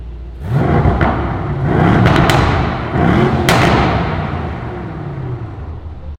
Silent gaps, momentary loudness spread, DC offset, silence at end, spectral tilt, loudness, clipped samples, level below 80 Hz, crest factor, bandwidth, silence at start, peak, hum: none; 15 LU; under 0.1%; 0 s; -6.5 dB/octave; -14 LUFS; under 0.1%; -26 dBFS; 14 dB; 16.5 kHz; 0 s; 0 dBFS; none